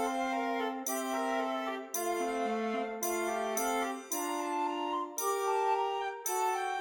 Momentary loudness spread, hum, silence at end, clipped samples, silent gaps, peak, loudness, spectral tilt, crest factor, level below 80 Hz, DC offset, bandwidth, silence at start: 4 LU; none; 0 s; under 0.1%; none; -20 dBFS; -33 LUFS; -2 dB/octave; 14 dB; -72 dBFS; under 0.1%; 19 kHz; 0 s